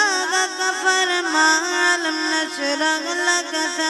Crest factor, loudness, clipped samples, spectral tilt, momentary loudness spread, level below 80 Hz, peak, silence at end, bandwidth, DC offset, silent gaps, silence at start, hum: 14 dB; -18 LUFS; under 0.1%; 1.5 dB/octave; 5 LU; -78 dBFS; -4 dBFS; 0 s; 12 kHz; under 0.1%; none; 0 s; none